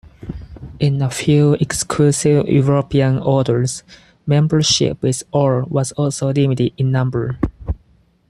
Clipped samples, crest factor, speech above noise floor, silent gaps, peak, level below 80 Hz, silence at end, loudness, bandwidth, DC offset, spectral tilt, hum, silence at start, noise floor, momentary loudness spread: under 0.1%; 14 dB; 39 dB; none; -2 dBFS; -38 dBFS; 0.55 s; -16 LUFS; 12.5 kHz; under 0.1%; -5.5 dB/octave; none; 0.2 s; -54 dBFS; 15 LU